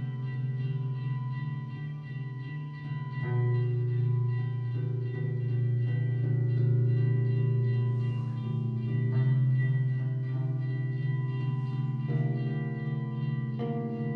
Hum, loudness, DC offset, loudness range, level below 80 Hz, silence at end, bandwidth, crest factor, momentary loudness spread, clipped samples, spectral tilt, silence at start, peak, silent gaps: none; -30 LUFS; under 0.1%; 4 LU; -70 dBFS; 0 s; 4.2 kHz; 12 dB; 9 LU; under 0.1%; -11 dB/octave; 0 s; -18 dBFS; none